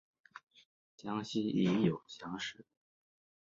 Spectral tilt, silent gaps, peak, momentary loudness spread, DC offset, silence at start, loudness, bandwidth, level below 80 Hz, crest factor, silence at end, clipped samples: -6.5 dB/octave; 0.43-0.47 s, 0.66-0.98 s; -18 dBFS; 25 LU; under 0.1%; 0.35 s; -36 LUFS; 7.6 kHz; -72 dBFS; 20 dB; 0.8 s; under 0.1%